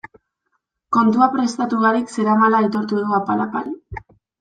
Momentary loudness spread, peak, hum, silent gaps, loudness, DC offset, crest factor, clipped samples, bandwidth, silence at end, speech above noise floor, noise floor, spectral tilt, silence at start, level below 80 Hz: 14 LU; -2 dBFS; none; none; -18 LUFS; under 0.1%; 16 dB; under 0.1%; 9.2 kHz; 0.4 s; 54 dB; -72 dBFS; -6 dB/octave; 0.9 s; -52 dBFS